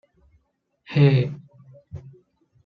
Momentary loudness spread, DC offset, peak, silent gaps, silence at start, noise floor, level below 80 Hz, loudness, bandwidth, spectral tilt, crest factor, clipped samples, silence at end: 24 LU; under 0.1%; -6 dBFS; none; 0.9 s; -70 dBFS; -58 dBFS; -20 LUFS; 5 kHz; -9.5 dB/octave; 20 dB; under 0.1%; 0.55 s